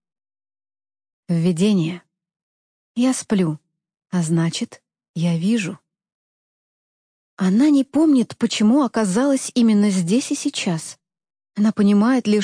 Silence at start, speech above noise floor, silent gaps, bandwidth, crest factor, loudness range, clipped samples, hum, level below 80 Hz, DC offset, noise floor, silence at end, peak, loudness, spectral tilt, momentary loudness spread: 1.3 s; over 72 dB; 2.43-2.95 s, 5.09-5.14 s, 6.14-7.37 s; 10.5 kHz; 12 dB; 7 LU; under 0.1%; none; -68 dBFS; under 0.1%; under -90 dBFS; 0 s; -8 dBFS; -19 LUFS; -6 dB/octave; 13 LU